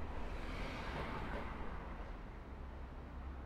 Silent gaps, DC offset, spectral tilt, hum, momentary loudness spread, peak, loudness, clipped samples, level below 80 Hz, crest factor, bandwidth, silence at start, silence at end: none; under 0.1%; -6.5 dB/octave; none; 8 LU; -32 dBFS; -47 LUFS; under 0.1%; -48 dBFS; 14 dB; 12.5 kHz; 0 s; 0 s